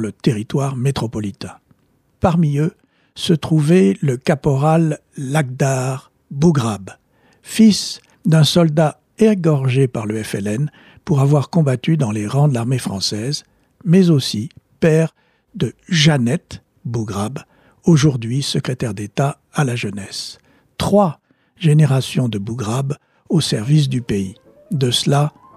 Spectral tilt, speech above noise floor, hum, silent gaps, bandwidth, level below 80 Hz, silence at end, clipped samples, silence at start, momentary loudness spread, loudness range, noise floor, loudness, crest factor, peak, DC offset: -6 dB/octave; 44 dB; none; none; 14 kHz; -48 dBFS; 0.3 s; under 0.1%; 0 s; 13 LU; 3 LU; -60 dBFS; -17 LUFS; 16 dB; -2 dBFS; under 0.1%